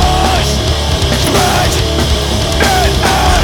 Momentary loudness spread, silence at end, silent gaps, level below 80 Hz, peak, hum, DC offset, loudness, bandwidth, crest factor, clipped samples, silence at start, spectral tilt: 3 LU; 0 s; none; -16 dBFS; 0 dBFS; none; under 0.1%; -11 LUFS; 19 kHz; 10 dB; under 0.1%; 0 s; -4 dB/octave